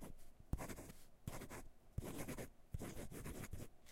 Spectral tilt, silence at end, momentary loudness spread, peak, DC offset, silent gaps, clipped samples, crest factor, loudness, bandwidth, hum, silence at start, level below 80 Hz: -5 dB/octave; 0 s; 8 LU; -26 dBFS; under 0.1%; none; under 0.1%; 24 dB; -53 LUFS; 16 kHz; none; 0 s; -56 dBFS